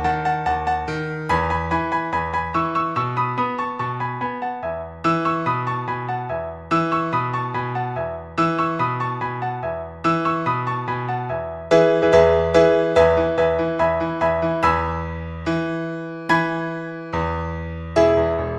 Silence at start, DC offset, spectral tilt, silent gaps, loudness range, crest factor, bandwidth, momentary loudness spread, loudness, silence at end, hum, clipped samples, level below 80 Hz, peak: 0 s; under 0.1%; -7 dB/octave; none; 6 LU; 20 dB; 10 kHz; 11 LU; -21 LUFS; 0 s; none; under 0.1%; -40 dBFS; -2 dBFS